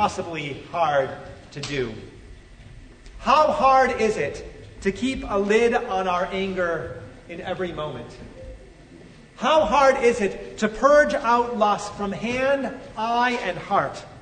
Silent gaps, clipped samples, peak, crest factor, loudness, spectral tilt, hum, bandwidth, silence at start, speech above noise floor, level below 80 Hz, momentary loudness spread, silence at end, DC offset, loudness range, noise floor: none; under 0.1%; -4 dBFS; 18 dB; -22 LUFS; -4.5 dB/octave; none; 9.6 kHz; 0 s; 24 dB; -46 dBFS; 20 LU; 0 s; under 0.1%; 7 LU; -46 dBFS